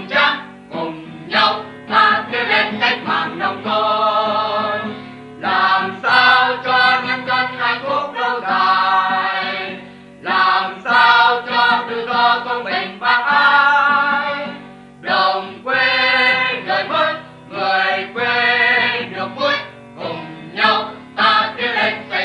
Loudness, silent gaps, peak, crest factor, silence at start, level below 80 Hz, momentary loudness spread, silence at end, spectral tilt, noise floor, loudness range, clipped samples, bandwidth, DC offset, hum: -15 LUFS; none; 0 dBFS; 16 dB; 0 s; -60 dBFS; 14 LU; 0 s; -4 dB/octave; -37 dBFS; 3 LU; under 0.1%; 10.5 kHz; under 0.1%; none